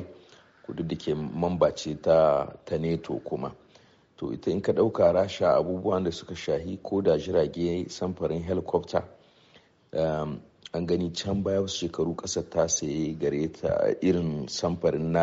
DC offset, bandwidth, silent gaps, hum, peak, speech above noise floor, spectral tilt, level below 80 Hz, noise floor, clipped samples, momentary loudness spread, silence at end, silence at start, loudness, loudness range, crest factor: under 0.1%; 8 kHz; none; none; -8 dBFS; 32 dB; -6 dB/octave; -54 dBFS; -59 dBFS; under 0.1%; 11 LU; 0 s; 0 s; -27 LUFS; 5 LU; 18 dB